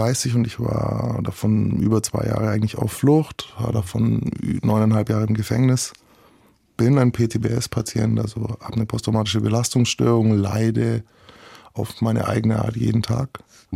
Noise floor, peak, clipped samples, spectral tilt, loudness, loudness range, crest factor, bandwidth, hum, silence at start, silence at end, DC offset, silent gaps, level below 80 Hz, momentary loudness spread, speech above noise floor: -56 dBFS; -4 dBFS; under 0.1%; -6 dB/octave; -21 LUFS; 1 LU; 16 dB; 15.5 kHz; none; 0 s; 0 s; under 0.1%; none; -48 dBFS; 8 LU; 36 dB